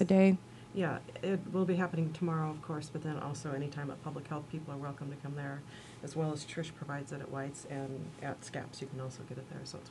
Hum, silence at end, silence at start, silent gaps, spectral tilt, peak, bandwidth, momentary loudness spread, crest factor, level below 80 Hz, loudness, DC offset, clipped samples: none; 0 s; 0 s; none; -7 dB/octave; -14 dBFS; 11.5 kHz; 11 LU; 22 dB; -70 dBFS; -37 LUFS; under 0.1%; under 0.1%